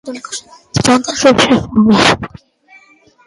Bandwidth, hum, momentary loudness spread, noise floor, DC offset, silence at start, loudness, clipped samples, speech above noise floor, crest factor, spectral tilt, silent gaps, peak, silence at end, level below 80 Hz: 11.5 kHz; none; 17 LU; -47 dBFS; under 0.1%; 0.05 s; -11 LUFS; under 0.1%; 35 dB; 14 dB; -4 dB/octave; none; 0 dBFS; 1 s; -40 dBFS